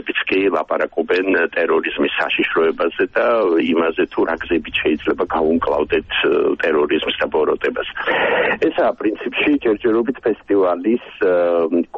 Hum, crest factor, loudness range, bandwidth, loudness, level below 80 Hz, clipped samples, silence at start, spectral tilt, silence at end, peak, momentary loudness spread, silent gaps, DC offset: none; 12 dB; 1 LU; 5.8 kHz; -18 LUFS; -48 dBFS; under 0.1%; 0 s; -6.5 dB/octave; 0 s; -6 dBFS; 4 LU; none; under 0.1%